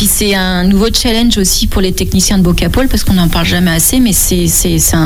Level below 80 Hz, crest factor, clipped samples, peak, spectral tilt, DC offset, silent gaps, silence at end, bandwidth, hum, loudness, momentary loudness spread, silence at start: -18 dBFS; 10 dB; under 0.1%; 0 dBFS; -4 dB/octave; under 0.1%; none; 0 s; 19 kHz; none; -10 LUFS; 3 LU; 0 s